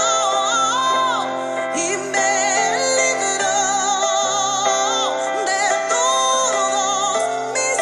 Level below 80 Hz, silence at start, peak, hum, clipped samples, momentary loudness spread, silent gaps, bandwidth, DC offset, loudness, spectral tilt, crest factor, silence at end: -68 dBFS; 0 s; -4 dBFS; none; under 0.1%; 4 LU; none; 12 kHz; under 0.1%; -18 LUFS; 0 dB/octave; 14 dB; 0 s